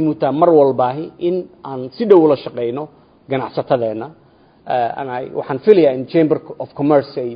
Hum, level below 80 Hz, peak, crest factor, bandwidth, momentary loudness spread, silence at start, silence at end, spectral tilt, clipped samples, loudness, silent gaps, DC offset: none; -60 dBFS; 0 dBFS; 16 dB; 5.2 kHz; 16 LU; 0 s; 0 s; -10 dB/octave; under 0.1%; -16 LUFS; none; under 0.1%